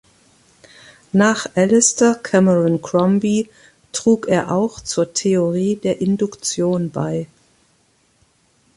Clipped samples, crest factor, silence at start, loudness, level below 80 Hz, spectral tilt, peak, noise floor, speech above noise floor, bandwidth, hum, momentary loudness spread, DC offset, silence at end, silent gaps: under 0.1%; 16 dB; 1.15 s; -17 LUFS; -56 dBFS; -5 dB/octave; -2 dBFS; -59 dBFS; 43 dB; 11.5 kHz; none; 8 LU; under 0.1%; 1.5 s; none